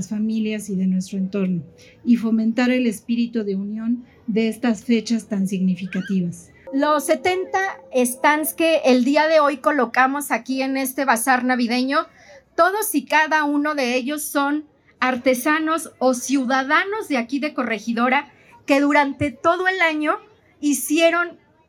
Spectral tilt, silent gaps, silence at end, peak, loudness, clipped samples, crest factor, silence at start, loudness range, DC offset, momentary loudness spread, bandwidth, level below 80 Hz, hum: -4.5 dB/octave; none; 0.35 s; -4 dBFS; -20 LUFS; under 0.1%; 16 dB; 0 s; 4 LU; under 0.1%; 8 LU; 17 kHz; -62 dBFS; none